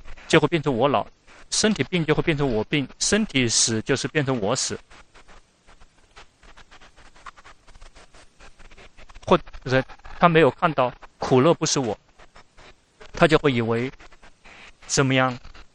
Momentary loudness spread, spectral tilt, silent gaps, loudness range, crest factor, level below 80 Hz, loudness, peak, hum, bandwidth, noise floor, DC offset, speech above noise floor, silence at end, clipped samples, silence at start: 11 LU; -4 dB/octave; none; 7 LU; 22 dB; -44 dBFS; -22 LUFS; -2 dBFS; none; 11 kHz; -51 dBFS; under 0.1%; 30 dB; 0.1 s; under 0.1%; 0.05 s